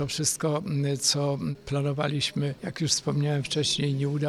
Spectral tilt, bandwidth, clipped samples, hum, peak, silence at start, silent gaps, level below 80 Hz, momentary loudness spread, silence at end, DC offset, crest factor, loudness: -4 dB/octave; 13.5 kHz; under 0.1%; none; -8 dBFS; 0 s; none; -58 dBFS; 6 LU; 0 s; under 0.1%; 18 dB; -27 LUFS